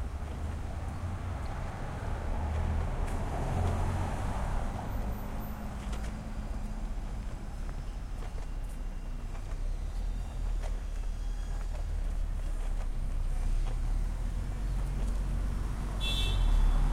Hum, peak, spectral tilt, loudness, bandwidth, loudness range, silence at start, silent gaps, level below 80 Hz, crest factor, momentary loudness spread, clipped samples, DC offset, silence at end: none; -18 dBFS; -6 dB/octave; -37 LUFS; 14.5 kHz; 6 LU; 0 s; none; -32 dBFS; 14 dB; 9 LU; under 0.1%; under 0.1%; 0 s